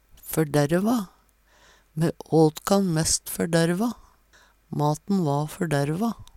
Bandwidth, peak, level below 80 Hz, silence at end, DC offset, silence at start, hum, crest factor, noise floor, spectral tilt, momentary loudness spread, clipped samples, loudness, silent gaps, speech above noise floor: 17 kHz; -6 dBFS; -52 dBFS; 0.1 s; under 0.1%; 0.25 s; none; 18 dB; -59 dBFS; -5.5 dB/octave; 9 LU; under 0.1%; -24 LUFS; none; 36 dB